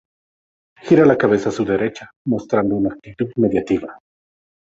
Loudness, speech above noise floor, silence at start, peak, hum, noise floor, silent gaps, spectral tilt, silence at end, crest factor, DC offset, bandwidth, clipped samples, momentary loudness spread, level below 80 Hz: -18 LUFS; over 73 dB; 0.85 s; -2 dBFS; none; under -90 dBFS; 2.16-2.25 s; -7.5 dB/octave; 0.75 s; 18 dB; under 0.1%; 7.8 kHz; under 0.1%; 13 LU; -52 dBFS